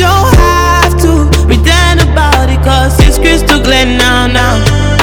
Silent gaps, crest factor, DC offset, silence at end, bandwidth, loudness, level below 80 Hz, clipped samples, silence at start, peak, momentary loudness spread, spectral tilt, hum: none; 6 dB; under 0.1%; 0 s; 19 kHz; -7 LUFS; -10 dBFS; 6%; 0 s; 0 dBFS; 2 LU; -4.5 dB/octave; none